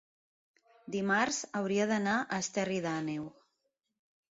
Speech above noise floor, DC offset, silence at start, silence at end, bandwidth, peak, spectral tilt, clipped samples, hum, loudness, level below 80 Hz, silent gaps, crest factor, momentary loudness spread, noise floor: 50 dB; under 0.1%; 0.85 s; 1 s; 7.6 kHz; -16 dBFS; -4 dB/octave; under 0.1%; none; -33 LUFS; -74 dBFS; none; 20 dB; 9 LU; -82 dBFS